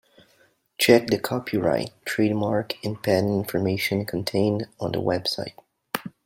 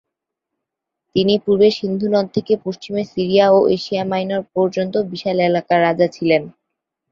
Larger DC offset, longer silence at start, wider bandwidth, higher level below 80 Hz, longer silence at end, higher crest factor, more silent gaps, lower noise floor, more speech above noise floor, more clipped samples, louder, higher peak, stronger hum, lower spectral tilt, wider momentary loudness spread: neither; second, 0.8 s vs 1.15 s; first, 16.5 kHz vs 7.4 kHz; about the same, -60 dBFS vs -58 dBFS; second, 0.15 s vs 0.6 s; first, 22 dB vs 16 dB; neither; second, -62 dBFS vs -81 dBFS; second, 39 dB vs 64 dB; neither; second, -24 LUFS vs -17 LUFS; about the same, -2 dBFS vs -2 dBFS; neither; about the same, -5.5 dB/octave vs -6.5 dB/octave; first, 12 LU vs 8 LU